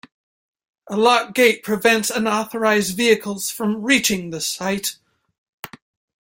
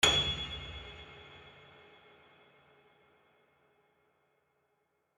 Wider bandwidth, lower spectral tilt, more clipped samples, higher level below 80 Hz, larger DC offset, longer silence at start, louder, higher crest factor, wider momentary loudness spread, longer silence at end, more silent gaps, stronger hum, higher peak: first, 17 kHz vs 13 kHz; first, -3 dB/octave vs -1.5 dB/octave; neither; second, -60 dBFS vs -54 dBFS; neither; first, 0.85 s vs 0 s; first, -19 LUFS vs -33 LUFS; second, 20 dB vs 28 dB; second, 11 LU vs 28 LU; second, 0.55 s vs 3.65 s; first, 5.38-5.63 s vs none; neither; first, -2 dBFS vs -10 dBFS